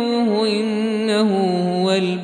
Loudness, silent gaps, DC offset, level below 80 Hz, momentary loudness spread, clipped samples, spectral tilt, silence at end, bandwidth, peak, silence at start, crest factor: -19 LUFS; none; under 0.1%; -64 dBFS; 3 LU; under 0.1%; -6 dB/octave; 0 s; 11 kHz; -6 dBFS; 0 s; 12 dB